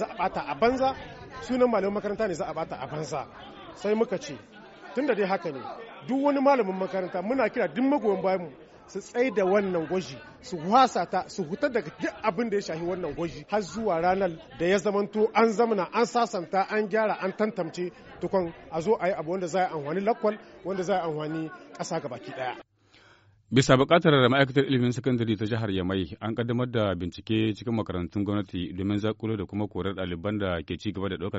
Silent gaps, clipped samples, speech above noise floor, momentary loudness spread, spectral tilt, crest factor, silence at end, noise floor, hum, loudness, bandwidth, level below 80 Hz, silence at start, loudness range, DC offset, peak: none; under 0.1%; 31 dB; 12 LU; -5 dB/octave; 20 dB; 0 s; -58 dBFS; none; -27 LUFS; 8 kHz; -56 dBFS; 0 s; 6 LU; under 0.1%; -6 dBFS